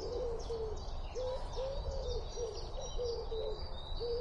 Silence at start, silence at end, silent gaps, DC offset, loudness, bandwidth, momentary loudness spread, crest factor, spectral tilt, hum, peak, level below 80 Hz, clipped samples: 0 s; 0 s; none; under 0.1%; -41 LUFS; 8 kHz; 4 LU; 12 dB; -5 dB/octave; none; -28 dBFS; -42 dBFS; under 0.1%